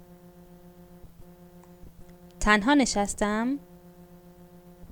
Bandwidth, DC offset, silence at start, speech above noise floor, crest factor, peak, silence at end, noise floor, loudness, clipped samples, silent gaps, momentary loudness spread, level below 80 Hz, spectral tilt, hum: 19.5 kHz; under 0.1%; 1.05 s; 27 dB; 24 dB; -6 dBFS; 0.05 s; -51 dBFS; -25 LUFS; under 0.1%; none; 10 LU; -44 dBFS; -3.5 dB/octave; none